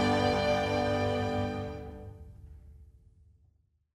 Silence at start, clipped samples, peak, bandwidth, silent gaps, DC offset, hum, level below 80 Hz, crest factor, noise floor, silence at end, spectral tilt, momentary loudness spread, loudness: 0 s; under 0.1%; -16 dBFS; 13.5 kHz; none; under 0.1%; none; -50 dBFS; 16 dB; -69 dBFS; 1.1 s; -6 dB/octave; 24 LU; -30 LUFS